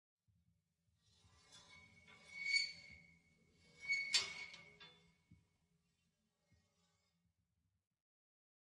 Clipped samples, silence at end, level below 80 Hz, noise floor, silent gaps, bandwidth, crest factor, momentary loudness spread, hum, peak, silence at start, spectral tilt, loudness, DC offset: under 0.1%; 3.3 s; -86 dBFS; -86 dBFS; none; 11 kHz; 28 dB; 26 LU; none; -22 dBFS; 1.5 s; 1.5 dB/octave; -40 LUFS; under 0.1%